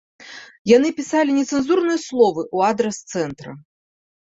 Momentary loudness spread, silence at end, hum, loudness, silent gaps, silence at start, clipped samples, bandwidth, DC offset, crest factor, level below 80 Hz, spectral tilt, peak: 22 LU; 0.7 s; none; -19 LUFS; 0.59-0.65 s; 0.2 s; under 0.1%; 8 kHz; under 0.1%; 18 dB; -60 dBFS; -4.5 dB/octave; -2 dBFS